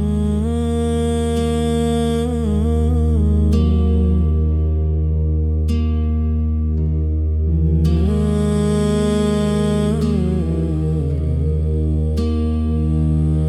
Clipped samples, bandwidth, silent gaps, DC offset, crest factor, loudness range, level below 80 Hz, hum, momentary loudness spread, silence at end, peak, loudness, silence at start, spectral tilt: under 0.1%; 11.5 kHz; none; under 0.1%; 12 dB; 2 LU; -24 dBFS; none; 3 LU; 0 s; -4 dBFS; -18 LUFS; 0 s; -8 dB/octave